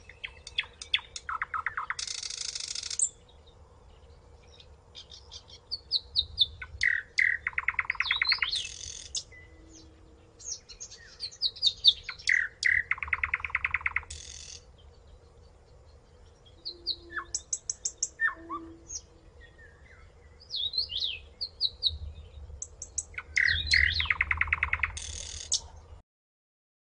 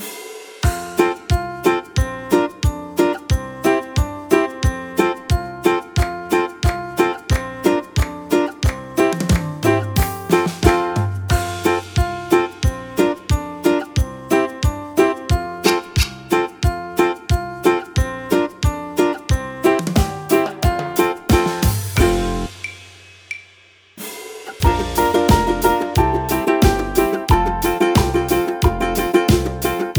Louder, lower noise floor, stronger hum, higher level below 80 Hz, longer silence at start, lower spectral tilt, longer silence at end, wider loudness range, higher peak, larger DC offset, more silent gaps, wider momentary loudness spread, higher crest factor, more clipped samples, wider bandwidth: second, -29 LUFS vs -19 LUFS; first, -56 dBFS vs -49 dBFS; neither; second, -52 dBFS vs -26 dBFS; about the same, 0.05 s vs 0 s; second, 0.5 dB/octave vs -5.5 dB/octave; first, 0.9 s vs 0 s; first, 9 LU vs 3 LU; second, -6 dBFS vs 0 dBFS; neither; neither; first, 18 LU vs 6 LU; first, 26 dB vs 18 dB; neither; second, 10.5 kHz vs over 20 kHz